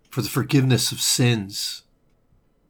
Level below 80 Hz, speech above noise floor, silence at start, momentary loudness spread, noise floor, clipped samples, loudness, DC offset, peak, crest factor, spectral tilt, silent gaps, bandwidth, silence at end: -58 dBFS; 40 dB; 0.1 s; 10 LU; -61 dBFS; under 0.1%; -21 LUFS; under 0.1%; -6 dBFS; 16 dB; -4 dB/octave; none; 19.5 kHz; 0.9 s